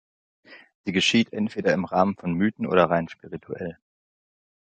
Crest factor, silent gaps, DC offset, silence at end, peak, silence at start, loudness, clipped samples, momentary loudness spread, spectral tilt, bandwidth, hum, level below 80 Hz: 22 dB; 0.75-0.84 s; under 0.1%; 0.95 s; -4 dBFS; 0.5 s; -23 LUFS; under 0.1%; 15 LU; -5 dB/octave; 9.2 kHz; none; -56 dBFS